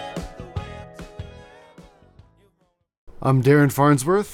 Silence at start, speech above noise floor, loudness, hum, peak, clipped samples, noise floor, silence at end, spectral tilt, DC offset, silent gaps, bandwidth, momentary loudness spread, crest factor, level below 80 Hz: 0 s; 51 dB; -18 LUFS; none; -6 dBFS; under 0.1%; -68 dBFS; 0 s; -7 dB/octave; under 0.1%; 2.98-3.07 s; 16.5 kHz; 23 LU; 18 dB; -46 dBFS